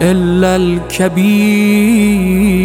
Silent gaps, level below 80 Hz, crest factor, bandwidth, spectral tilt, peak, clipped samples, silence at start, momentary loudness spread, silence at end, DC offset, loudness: none; -30 dBFS; 10 dB; 16.5 kHz; -6 dB/octave; 0 dBFS; under 0.1%; 0 s; 5 LU; 0 s; under 0.1%; -11 LUFS